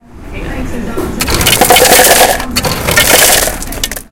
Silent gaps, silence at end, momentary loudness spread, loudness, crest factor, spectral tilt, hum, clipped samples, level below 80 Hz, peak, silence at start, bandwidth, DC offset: none; 0.1 s; 17 LU; -7 LUFS; 10 dB; -2 dB/octave; none; 3%; -24 dBFS; 0 dBFS; 0.15 s; over 20 kHz; under 0.1%